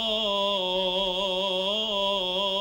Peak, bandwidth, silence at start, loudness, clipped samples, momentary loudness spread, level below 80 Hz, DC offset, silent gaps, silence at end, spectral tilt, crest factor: -14 dBFS; 16 kHz; 0 s; -25 LUFS; under 0.1%; 1 LU; -54 dBFS; under 0.1%; none; 0 s; -3.5 dB/octave; 14 dB